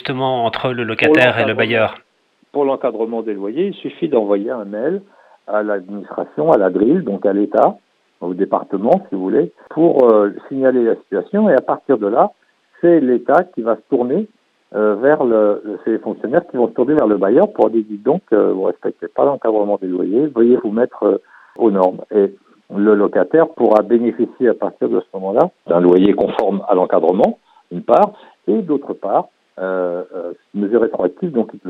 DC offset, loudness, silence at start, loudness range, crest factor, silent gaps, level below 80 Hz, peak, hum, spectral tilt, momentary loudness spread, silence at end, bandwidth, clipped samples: under 0.1%; -16 LUFS; 0.05 s; 4 LU; 16 dB; none; -60 dBFS; 0 dBFS; none; -8.5 dB/octave; 9 LU; 0 s; 5.4 kHz; under 0.1%